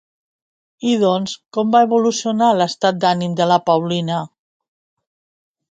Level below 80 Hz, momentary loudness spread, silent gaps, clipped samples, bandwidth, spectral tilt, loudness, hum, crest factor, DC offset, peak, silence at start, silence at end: -66 dBFS; 9 LU; none; under 0.1%; 9.2 kHz; -5.5 dB/octave; -17 LUFS; none; 18 dB; under 0.1%; 0 dBFS; 0.8 s; 1.45 s